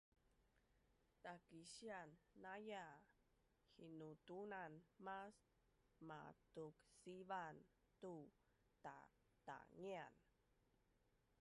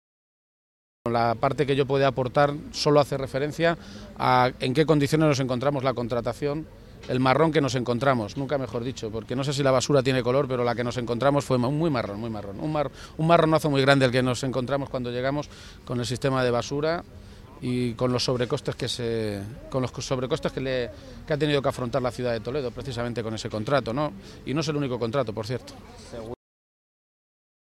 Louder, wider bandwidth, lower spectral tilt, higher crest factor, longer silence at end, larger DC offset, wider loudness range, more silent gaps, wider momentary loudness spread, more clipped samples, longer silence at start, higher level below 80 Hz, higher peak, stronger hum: second, -59 LUFS vs -25 LUFS; second, 11 kHz vs 14.5 kHz; about the same, -5 dB/octave vs -6 dB/octave; about the same, 20 dB vs 22 dB; second, 1.1 s vs 1.4 s; neither; about the same, 3 LU vs 5 LU; neither; about the same, 10 LU vs 12 LU; neither; second, 0.3 s vs 1.05 s; second, -86 dBFS vs -50 dBFS; second, -40 dBFS vs -4 dBFS; neither